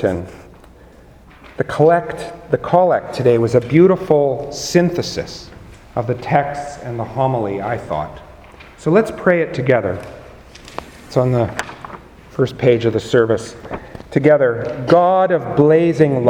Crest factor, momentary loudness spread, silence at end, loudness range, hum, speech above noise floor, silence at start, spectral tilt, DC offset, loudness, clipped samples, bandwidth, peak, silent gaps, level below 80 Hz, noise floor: 16 dB; 18 LU; 0 s; 6 LU; none; 28 dB; 0 s; -7 dB/octave; under 0.1%; -16 LUFS; under 0.1%; 15.5 kHz; 0 dBFS; none; -46 dBFS; -43 dBFS